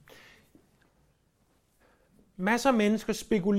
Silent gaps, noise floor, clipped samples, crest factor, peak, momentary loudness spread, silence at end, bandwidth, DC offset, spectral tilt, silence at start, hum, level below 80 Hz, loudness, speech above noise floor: none; -69 dBFS; under 0.1%; 18 dB; -12 dBFS; 6 LU; 0 s; 16 kHz; under 0.1%; -5.5 dB/octave; 2.4 s; none; -60 dBFS; -27 LUFS; 43 dB